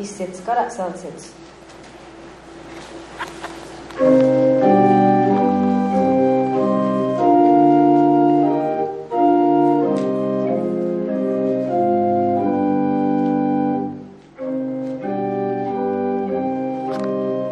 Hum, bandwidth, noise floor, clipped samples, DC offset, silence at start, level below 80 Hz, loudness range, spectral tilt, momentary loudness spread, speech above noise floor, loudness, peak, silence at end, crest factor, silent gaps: none; 11 kHz; -40 dBFS; under 0.1%; under 0.1%; 0 s; -58 dBFS; 8 LU; -8 dB/octave; 17 LU; 15 dB; -18 LUFS; -2 dBFS; 0 s; 16 dB; none